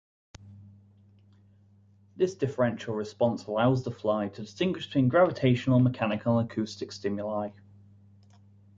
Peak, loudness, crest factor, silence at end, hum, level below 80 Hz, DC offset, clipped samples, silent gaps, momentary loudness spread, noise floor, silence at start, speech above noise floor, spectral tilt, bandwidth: -10 dBFS; -28 LUFS; 20 dB; 1.25 s; none; -62 dBFS; under 0.1%; under 0.1%; none; 11 LU; -60 dBFS; 0.45 s; 33 dB; -7.5 dB/octave; 7.6 kHz